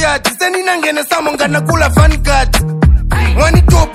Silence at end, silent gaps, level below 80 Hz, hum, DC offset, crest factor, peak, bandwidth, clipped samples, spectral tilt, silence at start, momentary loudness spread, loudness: 0 s; none; -14 dBFS; none; under 0.1%; 10 dB; 0 dBFS; 16 kHz; 0.6%; -5 dB/octave; 0 s; 5 LU; -11 LUFS